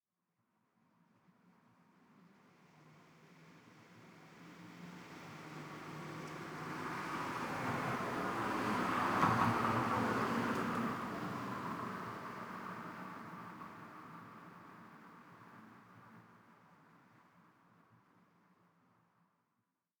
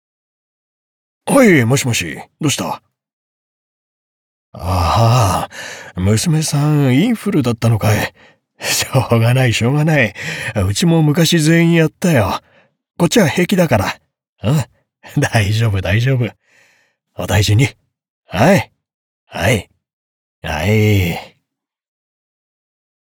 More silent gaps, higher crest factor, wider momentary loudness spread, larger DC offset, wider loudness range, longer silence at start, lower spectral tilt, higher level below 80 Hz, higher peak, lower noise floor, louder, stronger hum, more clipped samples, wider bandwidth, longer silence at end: second, none vs 3.13-4.52 s, 14.29-14.36 s, 18.10-18.22 s, 18.94-19.27 s, 19.93-20.42 s; first, 24 dB vs 14 dB; first, 24 LU vs 13 LU; neither; first, 23 LU vs 6 LU; first, 2.15 s vs 1.25 s; about the same, -5.5 dB/octave vs -5.5 dB/octave; second, -74 dBFS vs -44 dBFS; second, -18 dBFS vs -2 dBFS; first, -86 dBFS vs -77 dBFS; second, -39 LUFS vs -15 LUFS; neither; neither; about the same, over 20 kHz vs 19 kHz; first, 2.6 s vs 1.8 s